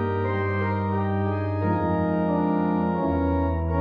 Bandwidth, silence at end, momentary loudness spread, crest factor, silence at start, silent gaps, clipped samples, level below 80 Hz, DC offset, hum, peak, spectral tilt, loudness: 4.9 kHz; 0 s; 2 LU; 12 dB; 0 s; none; under 0.1%; -38 dBFS; under 0.1%; none; -12 dBFS; -11 dB/octave; -24 LUFS